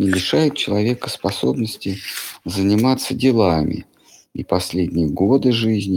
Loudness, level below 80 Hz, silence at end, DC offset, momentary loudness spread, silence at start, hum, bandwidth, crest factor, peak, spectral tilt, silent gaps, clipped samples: -19 LUFS; -44 dBFS; 0 s; under 0.1%; 10 LU; 0 s; none; 17.5 kHz; 16 dB; -2 dBFS; -5.5 dB/octave; none; under 0.1%